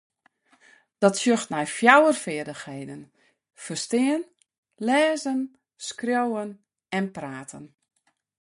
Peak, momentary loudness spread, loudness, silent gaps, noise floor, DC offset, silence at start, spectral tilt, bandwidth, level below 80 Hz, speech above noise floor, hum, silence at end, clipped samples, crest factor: -2 dBFS; 21 LU; -23 LUFS; 4.58-4.63 s; -64 dBFS; under 0.1%; 1 s; -4 dB/octave; 11.5 kHz; -72 dBFS; 40 dB; none; 0.75 s; under 0.1%; 24 dB